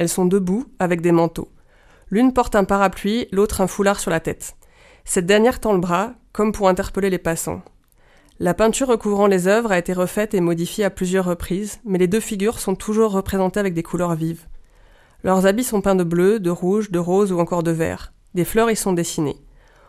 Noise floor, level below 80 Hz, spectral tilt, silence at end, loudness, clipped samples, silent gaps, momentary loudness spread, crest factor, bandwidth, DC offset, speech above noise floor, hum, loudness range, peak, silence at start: -53 dBFS; -42 dBFS; -5.5 dB/octave; 0.55 s; -19 LUFS; under 0.1%; none; 9 LU; 18 dB; 15.5 kHz; under 0.1%; 34 dB; none; 2 LU; -2 dBFS; 0 s